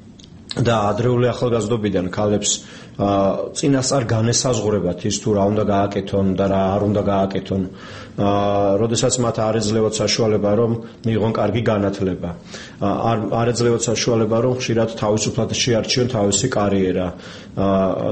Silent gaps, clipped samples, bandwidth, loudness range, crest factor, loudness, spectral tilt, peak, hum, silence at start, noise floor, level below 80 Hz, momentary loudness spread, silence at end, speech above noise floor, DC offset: none; under 0.1%; 8.8 kHz; 2 LU; 16 dB; -19 LUFS; -5 dB/octave; -4 dBFS; none; 0 s; -41 dBFS; -46 dBFS; 6 LU; 0 s; 22 dB; 0.2%